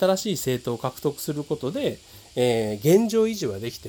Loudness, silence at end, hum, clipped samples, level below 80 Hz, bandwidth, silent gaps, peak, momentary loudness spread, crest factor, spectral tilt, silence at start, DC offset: -24 LUFS; 0 s; none; under 0.1%; -58 dBFS; over 20 kHz; none; -6 dBFS; 10 LU; 18 dB; -5.5 dB/octave; 0 s; under 0.1%